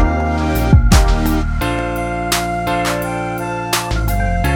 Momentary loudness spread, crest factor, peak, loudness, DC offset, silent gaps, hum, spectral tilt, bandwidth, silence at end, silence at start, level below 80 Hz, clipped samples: 7 LU; 14 dB; 0 dBFS; -17 LUFS; under 0.1%; none; none; -5 dB/octave; 18.5 kHz; 0 s; 0 s; -18 dBFS; under 0.1%